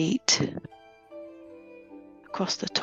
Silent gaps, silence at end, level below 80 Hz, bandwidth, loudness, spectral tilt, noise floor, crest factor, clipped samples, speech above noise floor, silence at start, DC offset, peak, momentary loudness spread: none; 0 s; -66 dBFS; 9 kHz; -26 LUFS; -3 dB/octave; -49 dBFS; 26 dB; under 0.1%; 22 dB; 0 s; under 0.1%; -6 dBFS; 26 LU